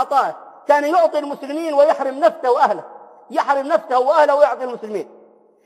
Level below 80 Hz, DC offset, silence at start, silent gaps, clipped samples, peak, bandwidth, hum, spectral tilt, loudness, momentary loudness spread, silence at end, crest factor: -82 dBFS; under 0.1%; 0 s; none; under 0.1%; 0 dBFS; 13 kHz; none; -4 dB/octave; -17 LUFS; 13 LU; 0.6 s; 16 dB